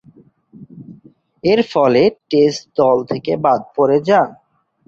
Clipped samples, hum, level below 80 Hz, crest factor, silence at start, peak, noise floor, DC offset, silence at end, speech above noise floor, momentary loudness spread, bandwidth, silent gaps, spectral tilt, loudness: under 0.1%; none; -56 dBFS; 14 dB; 0.6 s; -2 dBFS; -48 dBFS; under 0.1%; 0.55 s; 34 dB; 5 LU; 7.6 kHz; none; -6 dB/octave; -15 LUFS